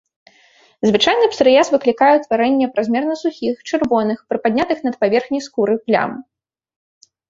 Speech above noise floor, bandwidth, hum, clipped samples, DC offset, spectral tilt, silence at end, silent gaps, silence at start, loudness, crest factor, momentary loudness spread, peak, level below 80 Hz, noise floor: 37 dB; 7.8 kHz; none; under 0.1%; under 0.1%; -4.5 dB/octave; 1.05 s; none; 0.85 s; -17 LUFS; 16 dB; 8 LU; 0 dBFS; -58 dBFS; -53 dBFS